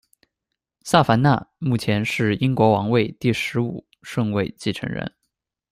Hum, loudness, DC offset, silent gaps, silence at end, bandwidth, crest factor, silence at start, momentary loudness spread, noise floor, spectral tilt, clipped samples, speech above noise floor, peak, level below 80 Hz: none; -21 LUFS; under 0.1%; none; 0.65 s; 15.5 kHz; 20 dB; 0.85 s; 12 LU; -82 dBFS; -6.5 dB/octave; under 0.1%; 62 dB; -2 dBFS; -54 dBFS